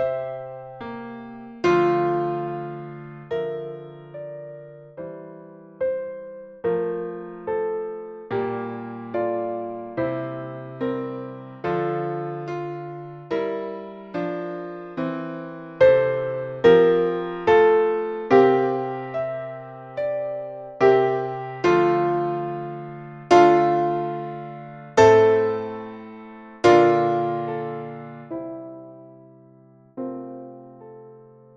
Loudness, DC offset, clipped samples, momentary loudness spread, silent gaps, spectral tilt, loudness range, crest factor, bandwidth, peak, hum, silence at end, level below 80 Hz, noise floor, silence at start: -22 LUFS; under 0.1%; under 0.1%; 22 LU; none; -6.5 dB/octave; 13 LU; 20 dB; 8 kHz; -2 dBFS; none; 0.35 s; -60 dBFS; -52 dBFS; 0 s